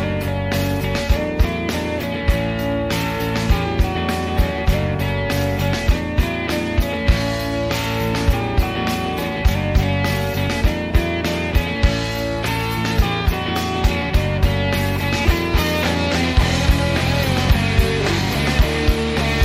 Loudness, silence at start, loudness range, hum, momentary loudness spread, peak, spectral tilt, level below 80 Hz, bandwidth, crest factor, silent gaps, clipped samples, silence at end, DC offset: -19 LUFS; 0 s; 3 LU; none; 4 LU; -2 dBFS; -5.5 dB/octave; -22 dBFS; 16 kHz; 18 dB; none; under 0.1%; 0 s; under 0.1%